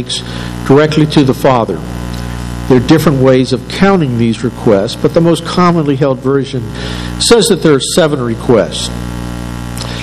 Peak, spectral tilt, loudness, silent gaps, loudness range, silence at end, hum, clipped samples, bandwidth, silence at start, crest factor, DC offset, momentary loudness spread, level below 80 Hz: 0 dBFS; -5.5 dB/octave; -11 LUFS; none; 1 LU; 0 s; 60 Hz at -25 dBFS; 1%; 14.5 kHz; 0 s; 10 dB; under 0.1%; 13 LU; -28 dBFS